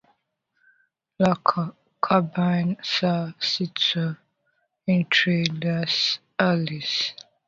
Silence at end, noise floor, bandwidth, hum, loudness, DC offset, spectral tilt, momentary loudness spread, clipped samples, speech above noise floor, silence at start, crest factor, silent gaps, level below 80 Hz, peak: 0.35 s; -73 dBFS; 7.6 kHz; none; -23 LUFS; under 0.1%; -5.5 dB/octave; 9 LU; under 0.1%; 50 dB; 1.2 s; 22 dB; none; -64 dBFS; -2 dBFS